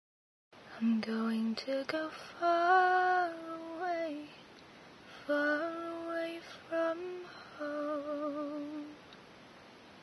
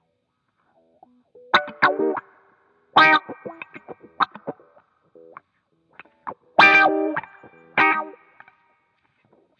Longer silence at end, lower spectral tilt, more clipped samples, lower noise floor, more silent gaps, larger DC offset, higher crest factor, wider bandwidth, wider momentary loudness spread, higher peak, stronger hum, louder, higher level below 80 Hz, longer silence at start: second, 0 s vs 1.5 s; first, -5.5 dB/octave vs -4 dB/octave; neither; second, -55 dBFS vs -73 dBFS; neither; neither; about the same, 20 dB vs 22 dB; first, 11 kHz vs 9.2 kHz; about the same, 25 LU vs 25 LU; second, -16 dBFS vs -2 dBFS; neither; second, -34 LUFS vs -18 LUFS; second, -80 dBFS vs -68 dBFS; second, 0.55 s vs 1.55 s